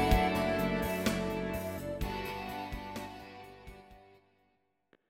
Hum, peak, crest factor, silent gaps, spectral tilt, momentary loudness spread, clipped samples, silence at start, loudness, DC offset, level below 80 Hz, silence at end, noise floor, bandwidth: none; -14 dBFS; 22 dB; none; -5.5 dB/octave; 20 LU; under 0.1%; 0 s; -34 LUFS; under 0.1%; -42 dBFS; 1.05 s; -76 dBFS; 17 kHz